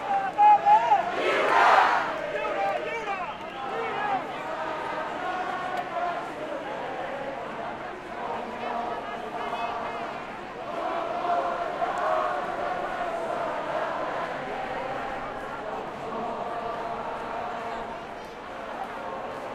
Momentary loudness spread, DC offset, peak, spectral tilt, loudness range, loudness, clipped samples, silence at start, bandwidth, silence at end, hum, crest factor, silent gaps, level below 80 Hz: 14 LU; under 0.1%; -6 dBFS; -4 dB/octave; 9 LU; -28 LUFS; under 0.1%; 0 s; 13 kHz; 0 s; none; 22 dB; none; -58 dBFS